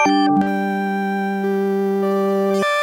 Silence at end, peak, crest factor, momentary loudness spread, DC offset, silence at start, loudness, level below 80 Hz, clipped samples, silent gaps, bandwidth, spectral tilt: 0 s; -6 dBFS; 12 dB; 5 LU; under 0.1%; 0 s; -19 LUFS; -62 dBFS; under 0.1%; none; 16 kHz; -6 dB/octave